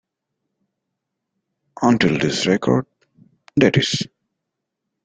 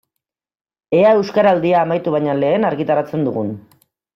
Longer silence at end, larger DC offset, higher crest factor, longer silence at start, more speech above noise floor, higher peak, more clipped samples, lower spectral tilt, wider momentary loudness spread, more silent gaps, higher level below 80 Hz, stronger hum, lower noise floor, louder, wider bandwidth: first, 1 s vs 0.55 s; neither; first, 20 dB vs 14 dB; first, 1.8 s vs 0.9 s; about the same, 63 dB vs 65 dB; about the same, -2 dBFS vs -4 dBFS; neither; second, -5 dB/octave vs -8 dB/octave; about the same, 9 LU vs 8 LU; neither; first, -56 dBFS vs -62 dBFS; neither; about the same, -80 dBFS vs -80 dBFS; about the same, -18 LUFS vs -16 LUFS; first, 9.4 kHz vs 6.4 kHz